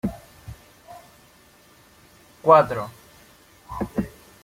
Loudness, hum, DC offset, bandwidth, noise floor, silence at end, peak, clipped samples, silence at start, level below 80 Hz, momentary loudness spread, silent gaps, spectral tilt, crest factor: -21 LUFS; none; under 0.1%; 16.5 kHz; -54 dBFS; 0.35 s; -2 dBFS; under 0.1%; 0.05 s; -50 dBFS; 29 LU; none; -7 dB/octave; 24 dB